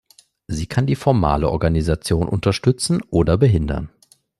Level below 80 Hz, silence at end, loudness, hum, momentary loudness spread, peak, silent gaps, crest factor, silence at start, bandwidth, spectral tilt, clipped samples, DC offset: -34 dBFS; 0.55 s; -19 LUFS; none; 10 LU; -2 dBFS; none; 16 dB; 0.5 s; 12.5 kHz; -6.5 dB/octave; under 0.1%; under 0.1%